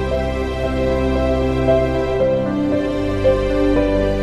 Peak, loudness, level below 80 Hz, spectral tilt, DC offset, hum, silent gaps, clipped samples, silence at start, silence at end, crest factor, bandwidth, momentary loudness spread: -4 dBFS; -18 LUFS; -26 dBFS; -7.5 dB/octave; under 0.1%; none; none; under 0.1%; 0 s; 0 s; 12 dB; 12.5 kHz; 4 LU